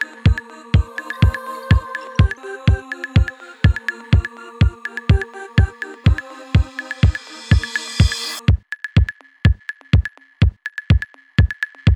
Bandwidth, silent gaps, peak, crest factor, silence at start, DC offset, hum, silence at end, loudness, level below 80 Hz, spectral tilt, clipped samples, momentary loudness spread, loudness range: 12 kHz; none; 0 dBFS; 18 dB; 0 s; under 0.1%; none; 0 s; -19 LUFS; -22 dBFS; -6 dB/octave; under 0.1%; 7 LU; 1 LU